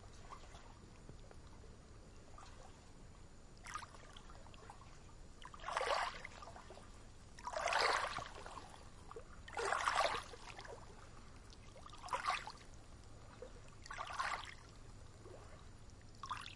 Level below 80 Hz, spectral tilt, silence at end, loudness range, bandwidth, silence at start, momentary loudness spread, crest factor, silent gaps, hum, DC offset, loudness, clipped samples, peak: -60 dBFS; -2.5 dB/octave; 0 s; 15 LU; 11.5 kHz; 0 s; 22 LU; 26 dB; none; none; under 0.1%; -42 LUFS; under 0.1%; -20 dBFS